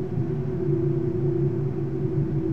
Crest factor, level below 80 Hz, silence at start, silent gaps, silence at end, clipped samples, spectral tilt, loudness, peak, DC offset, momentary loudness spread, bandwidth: 12 dB; -44 dBFS; 0 s; none; 0 s; under 0.1%; -11.5 dB/octave; -26 LUFS; -12 dBFS; 1%; 3 LU; 3.4 kHz